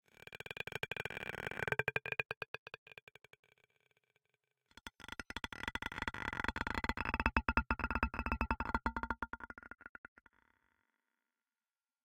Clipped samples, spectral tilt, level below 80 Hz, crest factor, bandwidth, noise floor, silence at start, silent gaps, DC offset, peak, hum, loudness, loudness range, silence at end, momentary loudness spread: under 0.1%; -5 dB/octave; -50 dBFS; 30 dB; 17 kHz; under -90 dBFS; 0.3 s; 2.37-2.41 s, 2.48-2.66 s, 2.78-2.86 s, 3.03-3.07 s, 3.39-3.43 s; under 0.1%; -12 dBFS; none; -40 LUFS; 11 LU; 2.15 s; 18 LU